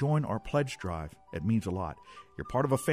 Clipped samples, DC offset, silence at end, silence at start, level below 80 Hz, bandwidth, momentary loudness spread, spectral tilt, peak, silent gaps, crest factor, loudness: under 0.1%; under 0.1%; 0 s; 0 s; -52 dBFS; 15.5 kHz; 13 LU; -7 dB/octave; -12 dBFS; none; 18 dB; -32 LUFS